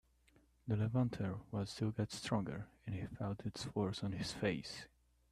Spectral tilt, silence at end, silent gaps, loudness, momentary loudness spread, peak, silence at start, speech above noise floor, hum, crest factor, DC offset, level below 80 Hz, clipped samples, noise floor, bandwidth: -6 dB/octave; 0.45 s; none; -41 LUFS; 10 LU; -24 dBFS; 0.65 s; 31 dB; none; 18 dB; under 0.1%; -64 dBFS; under 0.1%; -71 dBFS; 13 kHz